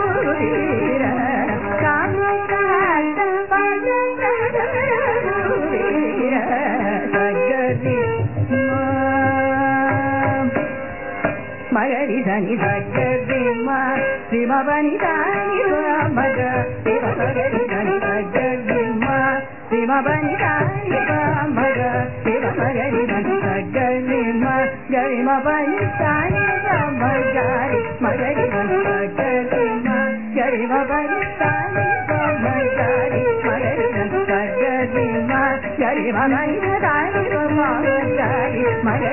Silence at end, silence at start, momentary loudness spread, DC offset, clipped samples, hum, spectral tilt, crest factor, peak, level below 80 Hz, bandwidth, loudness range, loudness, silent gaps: 0 s; 0 s; 3 LU; 1%; under 0.1%; none; -12 dB/octave; 14 dB; -4 dBFS; -46 dBFS; 3.1 kHz; 1 LU; -19 LUFS; none